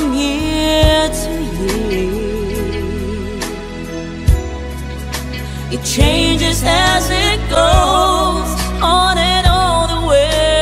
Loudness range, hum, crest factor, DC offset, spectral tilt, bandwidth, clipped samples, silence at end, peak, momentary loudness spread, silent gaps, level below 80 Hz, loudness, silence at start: 8 LU; none; 14 dB; under 0.1%; -4 dB/octave; 16 kHz; under 0.1%; 0 s; 0 dBFS; 12 LU; none; -22 dBFS; -15 LUFS; 0 s